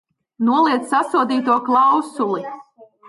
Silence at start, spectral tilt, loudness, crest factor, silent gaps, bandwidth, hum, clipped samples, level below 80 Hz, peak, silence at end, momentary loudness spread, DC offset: 0.4 s; -5 dB/octave; -18 LUFS; 14 dB; none; 11.5 kHz; none; under 0.1%; -74 dBFS; -6 dBFS; 0.25 s; 10 LU; under 0.1%